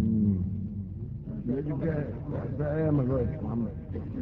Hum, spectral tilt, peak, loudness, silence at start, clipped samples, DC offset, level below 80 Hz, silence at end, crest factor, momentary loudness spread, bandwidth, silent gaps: none; -11 dB/octave; -14 dBFS; -31 LUFS; 0 s; under 0.1%; under 0.1%; -44 dBFS; 0 s; 14 dB; 11 LU; 4.1 kHz; none